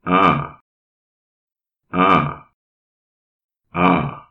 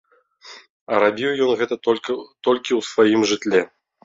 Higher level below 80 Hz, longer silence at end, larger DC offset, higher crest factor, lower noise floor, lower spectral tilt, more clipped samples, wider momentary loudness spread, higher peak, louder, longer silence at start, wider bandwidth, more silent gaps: first, -48 dBFS vs -64 dBFS; second, 0.1 s vs 0.4 s; neither; about the same, 18 dB vs 18 dB; first, under -90 dBFS vs -46 dBFS; first, -8 dB/octave vs -4 dB/octave; neither; first, 16 LU vs 7 LU; about the same, -2 dBFS vs -2 dBFS; first, -17 LUFS vs -20 LUFS; second, 0.05 s vs 0.45 s; second, 6.4 kHz vs 7.8 kHz; first, 0.61-1.47 s, 2.54-3.49 s vs 0.70-0.86 s